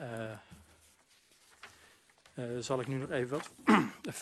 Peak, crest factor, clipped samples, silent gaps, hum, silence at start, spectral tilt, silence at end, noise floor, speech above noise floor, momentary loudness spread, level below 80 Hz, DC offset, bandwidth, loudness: -12 dBFS; 24 dB; under 0.1%; none; none; 0 s; -5.5 dB/octave; 0 s; -66 dBFS; 34 dB; 26 LU; -72 dBFS; under 0.1%; 13 kHz; -34 LUFS